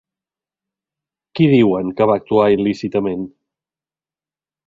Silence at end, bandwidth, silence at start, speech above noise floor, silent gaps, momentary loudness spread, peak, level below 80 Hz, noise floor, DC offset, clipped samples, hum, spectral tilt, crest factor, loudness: 1.4 s; 7.4 kHz; 1.35 s; over 75 dB; none; 14 LU; -2 dBFS; -54 dBFS; under -90 dBFS; under 0.1%; under 0.1%; none; -8.5 dB/octave; 18 dB; -16 LUFS